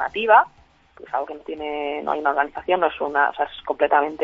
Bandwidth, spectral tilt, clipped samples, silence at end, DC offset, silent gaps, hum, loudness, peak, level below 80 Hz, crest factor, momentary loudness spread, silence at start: 6.4 kHz; -5.5 dB/octave; under 0.1%; 0 s; under 0.1%; none; none; -21 LUFS; -2 dBFS; -58 dBFS; 18 dB; 13 LU; 0 s